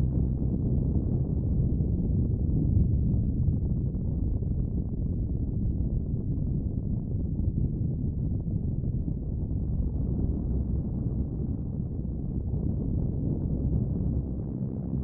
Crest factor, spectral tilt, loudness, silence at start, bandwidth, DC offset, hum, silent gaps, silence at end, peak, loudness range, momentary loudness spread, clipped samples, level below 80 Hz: 14 dB; -17.5 dB/octave; -30 LUFS; 0 s; 1.4 kHz; under 0.1%; none; none; 0 s; -14 dBFS; 4 LU; 5 LU; under 0.1%; -32 dBFS